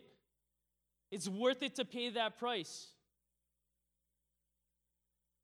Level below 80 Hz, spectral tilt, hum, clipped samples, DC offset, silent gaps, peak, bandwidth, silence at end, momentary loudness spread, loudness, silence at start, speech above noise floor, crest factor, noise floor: under -90 dBFS; -3.5 dB/octave; 60 Hz at -80 dBFS; under 0.1%; under 0.1%; none; -22 dBFS; over 20 kHz; 2.55 s; 14 LU; -39 LUFS; 1.1 s; 47 dB; 22 dB; -85 dBFS